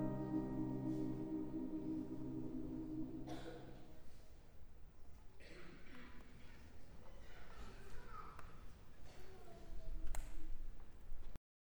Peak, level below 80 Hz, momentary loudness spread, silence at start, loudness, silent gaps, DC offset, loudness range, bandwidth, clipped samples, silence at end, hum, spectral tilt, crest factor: -30 dBFS; -52 dBFS; 20 LU; 0 s; -49 LUFS; none; under 0.1%; 15 LU; over 20 kHz; under 0.1%; 0.4 s; none; -7.5 dB/octave; 16 dB